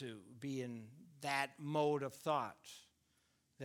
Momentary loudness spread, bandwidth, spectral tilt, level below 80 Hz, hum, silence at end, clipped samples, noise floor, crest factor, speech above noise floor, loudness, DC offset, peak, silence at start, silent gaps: 19 LU; 19.5 kHz; -5 dB/octave; -86 dBFS; none; 0 s; under 0.1%; -78 dBFS; 20 dB; 37 dB; -41 LUFS; under 0.1%; -22 dBFS; 0 s; none